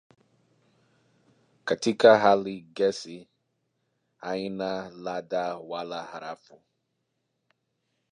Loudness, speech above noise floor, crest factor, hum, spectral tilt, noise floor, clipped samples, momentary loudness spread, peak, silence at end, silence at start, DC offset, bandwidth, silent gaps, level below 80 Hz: -26 LUFS; 52 dB; 24 dB; none; -4.5 dB/octave; -78 dBFS; under 0.1%; 22 LU; -4 dBFS; 1.75 s; 1.65 s; under 0.1%; 10.5 kHz; none; -74 dBFS